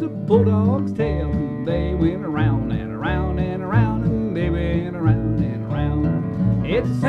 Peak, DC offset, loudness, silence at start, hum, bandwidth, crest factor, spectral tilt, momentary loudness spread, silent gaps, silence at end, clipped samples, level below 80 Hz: -2 dBFS; under 0.1%; -21 LUFS; 0 s; none; 6 kHz; 18 dB; -9.5 dB/octave; 6 LU; none; 0 s; under 0.1%; -32 dBFS